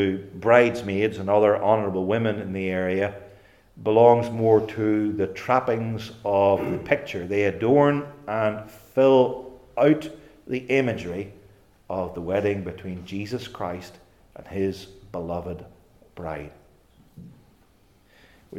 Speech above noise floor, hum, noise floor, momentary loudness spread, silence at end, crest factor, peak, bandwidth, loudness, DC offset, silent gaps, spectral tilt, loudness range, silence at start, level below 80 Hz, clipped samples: 36 dB; none; -59 dBFS; 17 LU; 0 s; 22 dB; -2 dBFS; 14.5 kHz; -23 LUFS; under 0.1%; none; -7.5 dB/octave; 12 LU; 0 s; -58 dBFS; under 0.1%